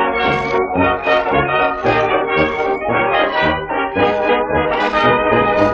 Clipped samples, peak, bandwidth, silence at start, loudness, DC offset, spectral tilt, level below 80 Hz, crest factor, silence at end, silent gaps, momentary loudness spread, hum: under 0.1%; 0 dBFS; 7.6 kHz; 0 s; -15 LUFS; under 0.1%; -6.5 dB/octave; -38 dBFS; 14 dB; 0 s; none; 3 LU; none